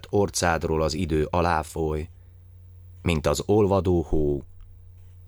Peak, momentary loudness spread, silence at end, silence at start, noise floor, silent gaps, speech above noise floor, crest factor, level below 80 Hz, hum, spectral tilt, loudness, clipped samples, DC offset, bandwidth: -6 dBFS; 9 LU; 0 s; 0.05 s; -47 dBFS; none; 24 dB; 18 dB; -36 dBFS; none; -5.5 dB/octave; -24 LUFS; under 0.1%; under 0.1%; over 20 kHz